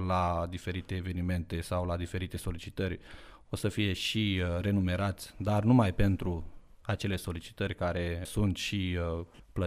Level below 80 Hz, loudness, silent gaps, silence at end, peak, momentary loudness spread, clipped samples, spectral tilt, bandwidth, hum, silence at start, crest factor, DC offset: -46 dBFS; -32 LUFS; none; 0 s; -12 dBFS; 11 LU; under 0.1%; -6 dB/octave; 15 kHz; none; 0 s; 20 dB; under 0.1%